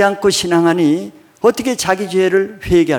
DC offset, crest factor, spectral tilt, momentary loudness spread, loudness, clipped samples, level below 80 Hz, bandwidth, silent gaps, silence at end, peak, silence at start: under 0.1%; 14 dB; -4.5 dB/octave; 4 LU; -15 LUFS; under 0.1%; -42 dBFS; 19 kHz; none; 0 s; 0 dBFS; 0 s